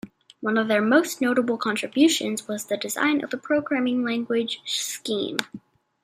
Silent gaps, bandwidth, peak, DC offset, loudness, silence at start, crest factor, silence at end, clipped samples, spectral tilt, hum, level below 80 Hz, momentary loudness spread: none; 16 kHz; -2 dBFS; under 0.1%; -24 LUFS; 0.05 s; 22 dB; 0.45 s; under 0.1%; -3 dB/octave; none; -72 dBFS; 9 LU